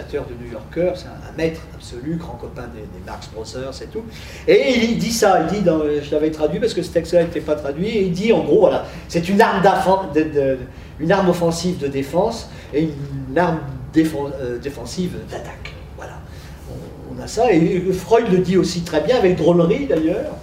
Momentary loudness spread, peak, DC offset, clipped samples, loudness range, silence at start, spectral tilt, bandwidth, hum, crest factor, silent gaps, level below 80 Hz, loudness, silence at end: 18 LU; 0 dBFS; under 0.1%; under 0.1%; 10 LU; 0 s; -6 dB/octave; 16 kHz; none; 18 dB; none; -40 dBFS; -18 LUFS; 0 s